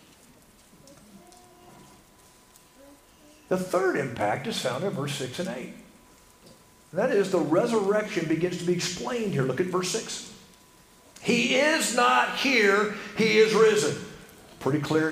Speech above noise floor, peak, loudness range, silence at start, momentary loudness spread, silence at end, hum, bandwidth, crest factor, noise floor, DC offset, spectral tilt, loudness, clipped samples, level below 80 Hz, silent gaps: 31 dB; -8 dBFS; 9 LU; 0.9 s; 13 LU; 0 s; none; 15.5 kHz; 18 dB; -56 dBFS; under 0.1%; -4 dB/octave; -25 LUFS; under 0.1%; -64 dBFS; none